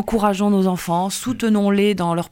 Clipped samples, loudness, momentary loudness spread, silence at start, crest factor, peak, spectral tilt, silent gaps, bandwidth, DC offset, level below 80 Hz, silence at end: under 0.1%; -19 LUFS; 4 LU; 0 s; 12 dB; -6 dBFS; -6 dB/octave; none; 17 kHz; under 0.1%; -44 dBFS; 0.05 s